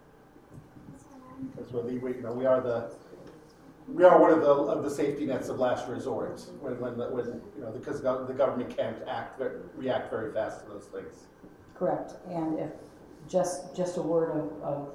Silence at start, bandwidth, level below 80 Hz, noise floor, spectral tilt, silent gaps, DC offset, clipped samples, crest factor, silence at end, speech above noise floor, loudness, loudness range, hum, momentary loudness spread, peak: 0.5 s; 13.5 kHz; -64 dBFS; -55 dBFS; -6.5 dB/octave; none; under 0.1%; under 0.1%; 24 dB; 0 s; 26 dB; -29 LUFS; 10 LU; none; 19 LU; -6 dBFS